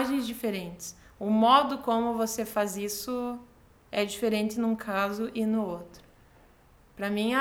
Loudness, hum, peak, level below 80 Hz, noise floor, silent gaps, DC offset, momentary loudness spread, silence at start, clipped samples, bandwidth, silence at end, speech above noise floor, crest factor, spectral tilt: -28 LUFS; none; -8 dBFS; -60 dBFS; -58 dBFS; none; under 0.1%; 14 LU; 0 s; under 0.1%; 17.5 kHz; 0 s; 30 dB; 20 dB; -4.5 dB/octave